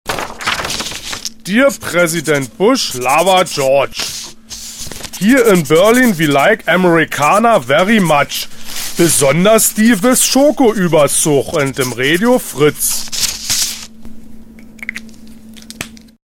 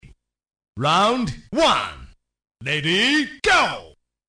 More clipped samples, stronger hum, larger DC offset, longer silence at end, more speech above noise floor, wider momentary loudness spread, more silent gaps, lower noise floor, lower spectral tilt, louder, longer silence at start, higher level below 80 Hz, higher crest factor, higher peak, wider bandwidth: neither; neither; neither; second, 0.25 s vs 0.4 s; second, 22 dB vs 31 dB; first, 16 LU vs 10 LU; neither; second, -33 dBFS vs -51 dBFS; about the same, -3.5 dB/octave vs -3.5 dB/octave; first, -12 LUFS vs -19 LUFS; second, 0.05 s vs 0.75 s; first, -40 dBFS vs -48 dBFS; about the same, 14 dB vs 16 dB; first, 0 dBFS vs -6 dBFS; first, 17 kHz vs 10.5 kHz